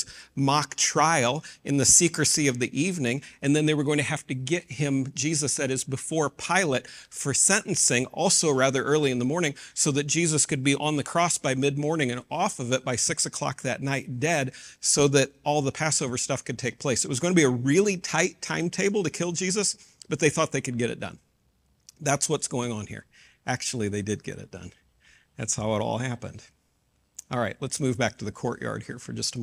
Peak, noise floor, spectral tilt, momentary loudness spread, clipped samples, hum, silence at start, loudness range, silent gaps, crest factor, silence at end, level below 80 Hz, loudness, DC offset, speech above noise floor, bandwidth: -4 dBFS; -69 dBFS; -3.5 dB/octave; 11 LU; under 0.1%; none; 0 s; 8 LU; none; 22 dB; 0 s; -60 dBFS; -25 LUFS; under 0.1%; 43 dB; 15.5 kHz